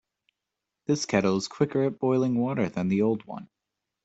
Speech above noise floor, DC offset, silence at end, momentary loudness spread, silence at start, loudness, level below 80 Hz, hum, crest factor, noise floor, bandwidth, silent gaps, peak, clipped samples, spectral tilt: 60 dB; under 0.1%; 0.6 s; 10 LU; 0.9 s; -26 LUFS; -66 dBFS; none; 20 dB; -86 dBFS; 8.2 kHz; none; -8 dBFS; under 0.1%; -6 dB/octave